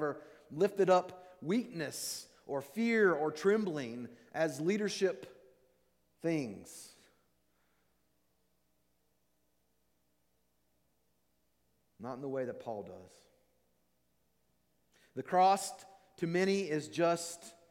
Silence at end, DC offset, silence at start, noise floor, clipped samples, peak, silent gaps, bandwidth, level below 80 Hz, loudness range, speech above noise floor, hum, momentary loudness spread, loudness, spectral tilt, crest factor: 0.2 s; under 0.1%; 0 s; -79 dBFS; under 0.1%; -16 dBFS; none; 16.5 kHz; -82 dBFS; 13 LU; 45 dB; none; 19 LU; -34 LUFS; -5 dB/octave; 20 dB